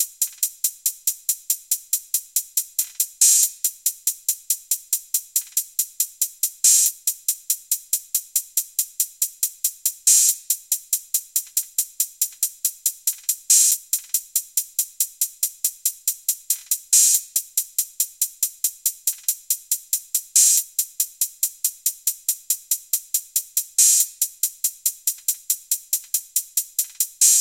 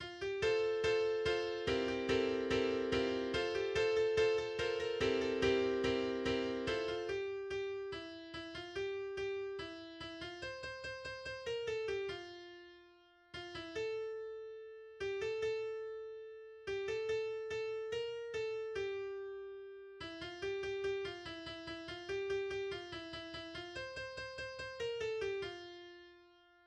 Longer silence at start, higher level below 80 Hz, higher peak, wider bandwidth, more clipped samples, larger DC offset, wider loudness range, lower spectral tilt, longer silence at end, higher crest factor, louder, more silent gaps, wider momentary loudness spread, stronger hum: about the same, 0 s vs 0 s; second, -76 dBFS vs -62 dBFS; first, 0 dBFS vs -22 dBFS; first, 17.5 kHz vs 9.8 kHz; neither; neither; second, 2 LU vs 9 LU; second, 8.5 dB/octave vs -4.5 dB/octave; second, 0 s vs 0.4 s; about the same, 22 dB vs 18 dB; first, -20 LUFS vs -39 LUFS; neither; second, 10 LU vs 14 LU; neither